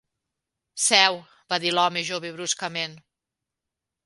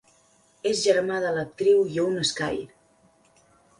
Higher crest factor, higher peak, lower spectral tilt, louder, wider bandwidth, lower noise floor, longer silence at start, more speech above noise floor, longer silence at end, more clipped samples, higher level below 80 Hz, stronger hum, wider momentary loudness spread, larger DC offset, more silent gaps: first, 26 dB vs 18 dB; first, 0 dBFS vs -8 dBFS; second, -1 dB/octave vs -3.5 dB/octave; about the same, -23 LUFS vs -24 LUFS; about the same, 12 kHz vs 11.5 kHz; first, -86 dBFS vs -61 dBFS; about the same, 0.75 s vs 0.65 s; first, 62 dB vs 38 dB; about the same, 1.05 s vs 1.15 s; neither; second, -76 dBFS vs -62 dBFS; neither; first, 15 LU vs 10 LU; neither; neither